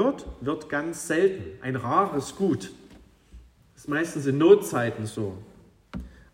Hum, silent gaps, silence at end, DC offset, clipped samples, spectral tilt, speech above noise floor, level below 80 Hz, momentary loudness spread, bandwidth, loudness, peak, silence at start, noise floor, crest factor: none; none; 0.25 s; under 0.1%; under 0.1%; -6 dB/octave; 27 dB; -52 dBFS; 22 LU; 16 kHz; -25 LUFS; -4 dBFS; 0 s; -52 dBFS; 22 dB